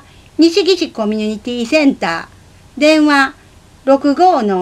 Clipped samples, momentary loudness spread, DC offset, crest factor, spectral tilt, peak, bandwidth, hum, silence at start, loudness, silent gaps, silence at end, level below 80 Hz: under 0.1%; 10 LU; under 0.1%; 14 dB; -4.5 dB/octave; 0 dBFS; 12 kHz; none; 0.4 s; -13 LUFS; none; 0 s; -50 dBFS